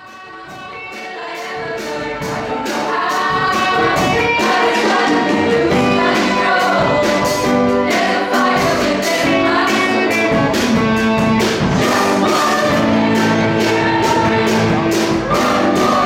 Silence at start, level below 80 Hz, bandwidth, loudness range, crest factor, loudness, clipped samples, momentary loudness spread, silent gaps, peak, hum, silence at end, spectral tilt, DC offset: 0 s; -42 dBFS; 17 kHz; 3 LU; 10 dB; -14 LUFS; under 0.1%; 9 LU; none; -4 dBFS; none; 0 s; -4.5 dB/octave; under 0.1%